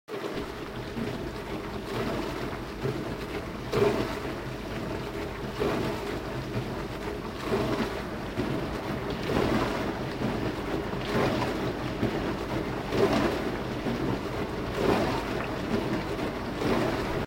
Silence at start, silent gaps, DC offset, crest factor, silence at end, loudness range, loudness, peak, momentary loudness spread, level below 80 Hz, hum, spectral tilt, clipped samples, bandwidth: 0.1 s; none; under 0.1%; 20 dB; 0 s; 4 LU; -31 LUFS; -10 dBFS; 8 LU; -44 dBFS; none; -6 dB/octave; under 0.1%; 16 kHz